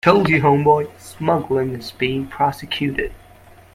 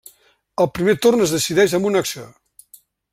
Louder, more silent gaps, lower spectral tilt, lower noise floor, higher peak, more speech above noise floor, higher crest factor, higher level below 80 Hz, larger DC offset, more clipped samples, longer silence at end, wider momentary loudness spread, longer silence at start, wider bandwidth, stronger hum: about the same, -19 LUFS vs -18 LUFS; neither; first, -6.5 dB/octave vs -4 dB/octave; second, -46 dBFS vs -54 dBFS; about the same, 0 dBFS vs -2 dBFS; second, 28 dB vs 37 dB; about the same, 18 dB vs 18 dB; first, -44 dBFS vs -54 dBFS; neither; neither; second, 0.55 s vs 0.85 s; about the same, 12 LU vs 12 LU; second, 0.05 s vs 0.6 s; about the same, 16 kHz vs 16 kHz; neither